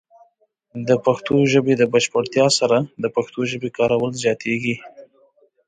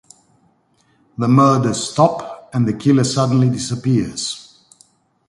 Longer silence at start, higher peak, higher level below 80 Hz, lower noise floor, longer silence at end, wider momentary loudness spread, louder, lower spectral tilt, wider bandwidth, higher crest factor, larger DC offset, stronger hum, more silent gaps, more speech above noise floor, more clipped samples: second, 0.75 s vs 1.2 s; second, -4 dBFS vs 0 dBFS; second, -60 dBFS vs -52 dBFS; about the same, -62 dBFS vs -59 dBFS; second, 0.65 s vs 0.85 s; second, 8 LU vs 12 LU; about the same, -19 LUFS vs -17 LUFS; second, -4.5 dB/octave vs -6 dB/octave; second, 9.6 kHz vs 11.5 kHz; about the same, 16 dB vs 18 dB; neither; neither; neither; about the same, 43 dB vs 44 dB; neither